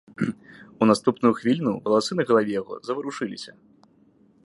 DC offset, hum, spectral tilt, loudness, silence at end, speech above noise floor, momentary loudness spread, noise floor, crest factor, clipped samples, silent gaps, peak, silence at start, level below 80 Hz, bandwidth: under 0.1%; none; -6 dB/octave; -24 LUFS; 0.95 s; 36 dB; 12 LU; -58 dBFS; 20 dB; under 0.1%; none; -4 dBFS; 0.2 s; -66 dBFS; 11.5 kHz